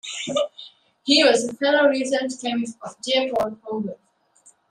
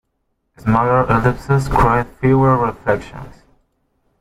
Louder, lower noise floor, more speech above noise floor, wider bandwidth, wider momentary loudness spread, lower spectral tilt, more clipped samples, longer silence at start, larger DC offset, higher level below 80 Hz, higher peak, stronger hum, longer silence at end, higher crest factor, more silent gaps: second, -21 LUFS vs -16 LUFS; second, -57 dBFS vs -69 dBFS; second, 35 dB vs 54 dB; about the same, 12.5 kHz vs 13 kHz; first, 16 LU vs 9 LU; second, -2.5 dB/octave vs -8.5 dB/octave; neither; second, 0.05 s vs 0.65 s; neither; second, -66 dBFS vs -32 dBFS; about the same, -4 dBFS vs -2 dBFS; neither; second, 0.75 s vs 0.9 s; about the same, 18 dB vs 16 dB; neither